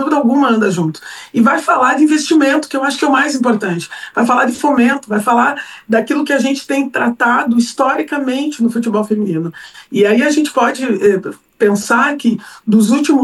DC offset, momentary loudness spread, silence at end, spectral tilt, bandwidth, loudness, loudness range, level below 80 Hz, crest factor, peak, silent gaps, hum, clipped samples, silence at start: under 0.1%; 8 LU; 0 s; -5 dB/octave; 12.5 kHz; -14 LUFS; 2 LU; -62 dBFS; 12 dB; 0 dBFS; none; none; under 0.1%; 0 s